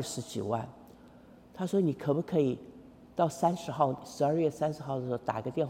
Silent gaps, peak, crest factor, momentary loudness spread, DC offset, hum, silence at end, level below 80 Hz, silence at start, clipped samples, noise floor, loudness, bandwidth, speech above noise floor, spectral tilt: none; -12 dBFS; 20 dB; 11 LU; under 0.1%; none; 0 s; -66 dBFS; 0 s; under 0.1%; -55 dBFS; -32 LUFS; 16.5 kHz; 24 dB; -6.5 dB/octave